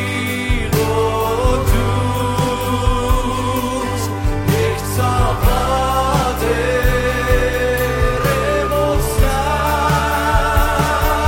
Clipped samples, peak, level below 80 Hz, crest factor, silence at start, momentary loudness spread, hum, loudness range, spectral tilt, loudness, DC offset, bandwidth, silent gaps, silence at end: under 0.1%; -2 dBFS; -22 dBFS; 14 dB; 0 s; 3 LU; none; 2 LU; -5 dB/octave; -17 LUFS; under 0.1%; 16.5 kHz; none; 0 s